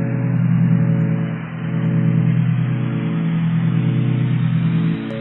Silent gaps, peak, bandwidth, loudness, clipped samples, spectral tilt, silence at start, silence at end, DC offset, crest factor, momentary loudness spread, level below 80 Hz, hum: none; -6 dBFS; 4 kHz; -18 LUFS; under 0.1%; -11.5 dB/octave; 0 s; 0 s; under 0.1%; 12 dB; 5 LU; -52 dBFS; none